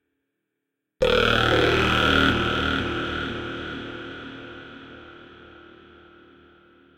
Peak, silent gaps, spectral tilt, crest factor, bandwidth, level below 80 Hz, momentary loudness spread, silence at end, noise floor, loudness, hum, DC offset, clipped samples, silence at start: -6 dBFS; none; -5 dB/octave; 20 dB; 16.5 kHz; -40 dBFS; 22 LU; 1.5 s; -81 dBFS; -22 LUFS; none; under 0.1%; under 0.1%; 1 s